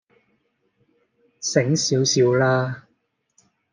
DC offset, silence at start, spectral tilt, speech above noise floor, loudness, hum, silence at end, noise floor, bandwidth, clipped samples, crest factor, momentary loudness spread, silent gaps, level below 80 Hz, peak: under 0.1%; 1.4 s; -4.5 dB/octave; 51 dB; -20 LUFS; none; 0.9 s; -70 dBFS; 10.5 kHz; under 0.1%; 20 dB; 12 LU; none; -68 dBFS; -4 dBFS